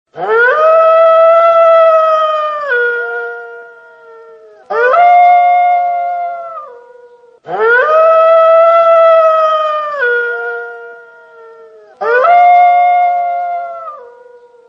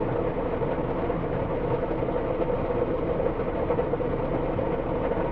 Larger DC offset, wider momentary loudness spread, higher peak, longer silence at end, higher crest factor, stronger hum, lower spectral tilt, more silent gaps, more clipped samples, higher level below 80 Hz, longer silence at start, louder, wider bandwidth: neither; first, 17 LU vs 1 LU; first, 0 dBFS vs -12 dBFS; first, 0.65 s vs 0 s; about the same, 10 dB vs 14 dB; neither; second, -3 dB/octave vs -10.5 dB/octave; neither; neither; second, -70 dBFS vs -38 dBFS; first, 0.15 s vs 0 s; first, -9 LUFS vs -28 LUFS; first, 6 kHz vs 4.9 kHz